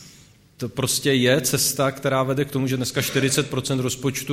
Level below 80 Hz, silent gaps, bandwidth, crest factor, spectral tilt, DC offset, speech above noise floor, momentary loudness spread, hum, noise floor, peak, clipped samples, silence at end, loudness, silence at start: -54 dBFS; none; 16 kHz; 18 dB; -4 dB/octave; under 0.1%; 29 dB; 6 LU; none; -51 dBFS; -4 dBFS; under 0.1%; 0 s; -21 LUFS; 0 s